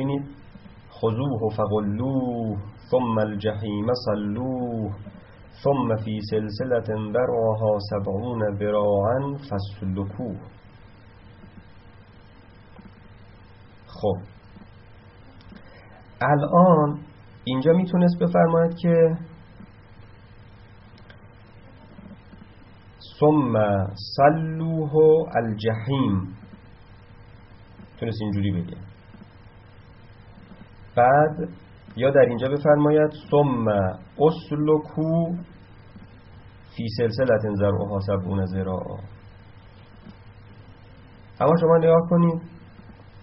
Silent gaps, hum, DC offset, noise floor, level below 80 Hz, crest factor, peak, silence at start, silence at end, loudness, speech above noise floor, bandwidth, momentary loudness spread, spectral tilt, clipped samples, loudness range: none; none; under 0.1%; -48 dBFS; -52 dBFS; 20 dB; -4 dBFS; 0 s; 0 s; -22 LUFS; 27 dB; 5.8 kHz; 15 LU; -7 dB/octave; under 0.1%; 12 LU